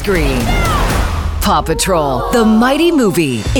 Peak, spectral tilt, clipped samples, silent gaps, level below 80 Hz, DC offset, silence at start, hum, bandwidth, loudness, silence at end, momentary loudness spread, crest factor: -2 dBFS; -5 dB/octave; under 0.1%; none; -20 dBFS; under 0.1%; 0 s; none; 20 kHz; -13 LUFS; 0 s; 5 LU; 10 dB